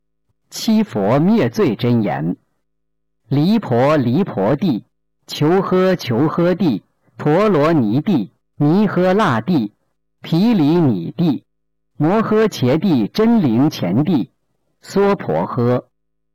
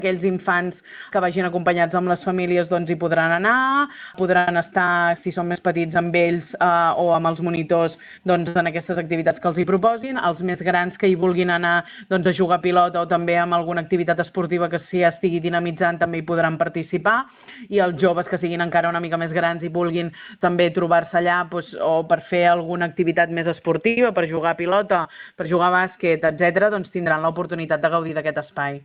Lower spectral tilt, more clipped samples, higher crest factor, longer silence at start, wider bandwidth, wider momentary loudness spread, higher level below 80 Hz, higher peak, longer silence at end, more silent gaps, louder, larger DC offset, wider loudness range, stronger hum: second, -7.5 dB/octave vs -10.5 dB/octave; neither; second, 8 dB vs 16 dB; first, 0.5 s vs 0 s; first, 17 kHz vs 4.9 kHz; first, 9 LU vs 6 LU; first, -52 dBFS vs -60 dBFS; second, -10 dBFS vs -4 dBFS; first, 0.55 s vs 0.05 s; neither; first, -16 LUFS vs -20 LUFS; neither; about the same, 2 LU vs 2 LU; neither